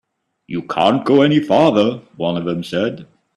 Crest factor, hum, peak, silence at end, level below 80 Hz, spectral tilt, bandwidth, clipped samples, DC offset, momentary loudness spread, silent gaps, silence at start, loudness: 16 dB; none; 0 dBFS; 0.3 s; -56 dBFS; -7 dB/octave; 11.5 kHz; under 0.1%; under 0.1%; 12 LU; none; 0.5 s; -16 LUFS